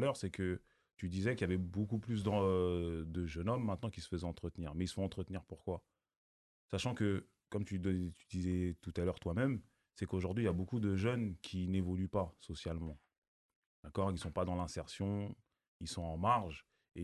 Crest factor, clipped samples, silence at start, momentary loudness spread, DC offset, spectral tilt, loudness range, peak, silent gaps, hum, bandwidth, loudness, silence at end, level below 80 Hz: 18 dB; under 0.1%; 0 s; 10 LU; under 0.1%; -7 dB/octave; 4 LU; -20 dBFS; 6.16-6.69 s, 13.18-13.22 s, 13.28-13.49 s, 13.56-13.83 s, 15.68-15.80 s; none; 12 kHz; -39 LUFS; 0 s; -52 dBFS